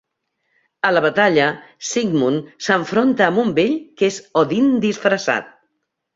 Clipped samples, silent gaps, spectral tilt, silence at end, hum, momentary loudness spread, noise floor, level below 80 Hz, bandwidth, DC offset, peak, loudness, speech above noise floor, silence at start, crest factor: under 0.1%; none; -4.5 dB/octave; 0.65 s; none; 7 LU; -73 dBFS; -60 dBFS; 7.8 kHz; under 0.1%; -2 dBFS; -18 LUFS; 56 dB; 0.85 s; 16 dB